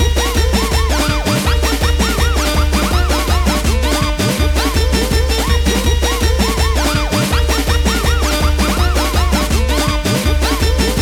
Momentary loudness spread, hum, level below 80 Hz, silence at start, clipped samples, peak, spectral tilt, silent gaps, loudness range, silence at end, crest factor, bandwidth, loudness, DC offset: 1 LU; none; -16 dBFS; 0 s; under 0.1%; 0 dBFS; -4.5 dB/octave; none; 0 LU; 0 s; 12 dB; 18 kHz; -15 LUFS; under 0.1%